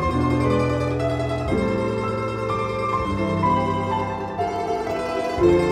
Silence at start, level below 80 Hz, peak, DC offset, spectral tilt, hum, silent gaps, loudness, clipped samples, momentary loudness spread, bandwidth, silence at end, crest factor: 0 s; -38 dBFS; -6 dBFS; under 0.1%; -7 dB/octave; none; none; -23 LUFS; under 0.1%; 5 LU; 12 kHz; 0 s; 16 dB